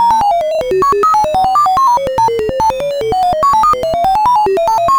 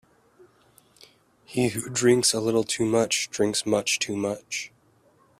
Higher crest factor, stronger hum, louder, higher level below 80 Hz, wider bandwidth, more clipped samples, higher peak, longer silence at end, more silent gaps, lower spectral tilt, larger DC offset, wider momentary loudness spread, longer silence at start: second, 10 dB vs 20 dB; neither; first, -12 LUFS vs -24 LUFS; first, -36 dBFS vs -62 dBFS; first, over 20 kHz vs 15 kHz; neither; first, 0 dBFS vs -8 dBFS; second, 0 s vs 0.75 s; neither; about the same, -4.5 dB/octave vs -3.5 dB/octave; neither; second, 4 LU vs 12 LU; second, 0 s vs 1.5 s